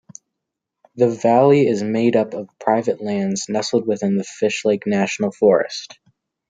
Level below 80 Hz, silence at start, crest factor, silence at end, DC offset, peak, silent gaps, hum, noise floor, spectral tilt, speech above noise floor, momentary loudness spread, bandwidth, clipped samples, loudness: -66 dBFS; 0.95 s; 18 dB; 0.65 s; under 0.1%; -2 dBFS; none; none; -81 dBFS; -5.5 dB/octave; 63 dB; 8 LU; 9.4 kHz; under 0.1%; -19 LUFS